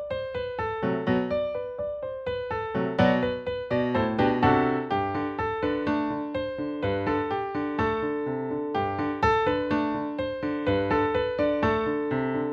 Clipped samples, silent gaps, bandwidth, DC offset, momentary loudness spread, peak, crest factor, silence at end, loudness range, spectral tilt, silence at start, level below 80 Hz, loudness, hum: under 0.1%; none; 7 kHz; under 0.1%; 8 LU; -8 dBFS; 18 dB; 0 s; 3 LU; -8 dB/octave; 0 s; -48 dBFS; -27 LUFS; none